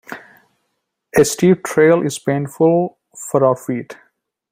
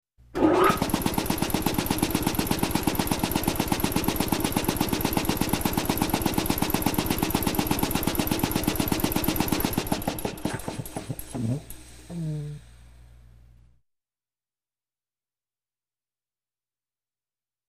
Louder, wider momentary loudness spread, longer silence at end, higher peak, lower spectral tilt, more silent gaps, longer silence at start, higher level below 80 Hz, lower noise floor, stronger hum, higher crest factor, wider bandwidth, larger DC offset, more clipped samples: first, -16 LUFS vs -26 LUFS; first, 18 LU vs 9 LU; second, 0.6 s vs 4.7 s; first, -2 dBFS vs -6 dBFS; about the same, -5.5 dB/octave vs -4.5 dB/octave; neither; second, 0.1 s vs 0.35 s; second, -54 dBFS vs -40 dBFS; second, -73 dBFS vs under -90 dBFS; neither; about the same, 16 dB vs 20 dB; about the same, 16 kHz vs 15.5 kHz; neither; neither